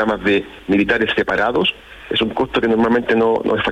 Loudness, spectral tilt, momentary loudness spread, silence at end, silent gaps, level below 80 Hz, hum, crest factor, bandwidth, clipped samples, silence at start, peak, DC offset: -17 LUFS; -6 dB/octave; 5 LU; 0 s; none; -44 dBFS; none; 12 dB; 11.5 kHz; under 0.1%; 0 s; -4 dBFS; under 0.1%